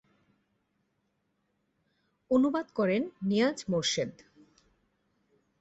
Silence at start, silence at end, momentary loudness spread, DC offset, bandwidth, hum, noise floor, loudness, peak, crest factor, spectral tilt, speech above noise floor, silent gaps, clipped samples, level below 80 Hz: 2.3 s; 1.5 s; 4 LU; under 0.1%; 8.2 kHz; none; -77 dBFS; -29 LUFS; -16 dBFS; 18 dB; -4.5 dB/octave; 49 dB; none; under 0.1%; -70 dBFS